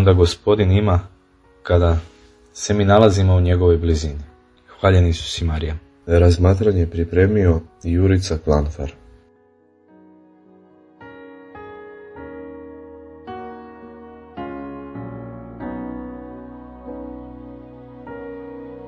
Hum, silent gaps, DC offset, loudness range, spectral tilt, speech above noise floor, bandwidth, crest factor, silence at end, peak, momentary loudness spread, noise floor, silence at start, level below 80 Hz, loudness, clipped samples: none; none; under 0.1%; 20 LU; -7 dB/octave; 40 dB; 10.5 kHz; 20 dB; 0 s; 0 dBFS; 24 LU; -55 dBFS; 0 s; -32 dBFS; -18 LUFS; under 0.1%